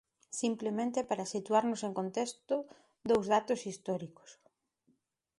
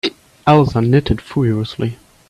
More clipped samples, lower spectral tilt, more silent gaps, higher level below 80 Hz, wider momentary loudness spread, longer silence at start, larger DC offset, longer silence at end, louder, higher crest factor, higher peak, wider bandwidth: neither; second, -4.5 dB/octave vs -8 dB/octave; neither; second, -76 dBFS vs -38 dBFS; about the same, 9 LU vs 11 LU; first, 0.3 s vs 0.05 s; neither; first, 1.05 s vs 0.35 s; second, -34 LUFS vs -16 LUFS; about the same, 20 dB vs 16 dB; second, -14 dBFS vs 0 dBFS; about the same, 11.5 kHz vs 12 kHz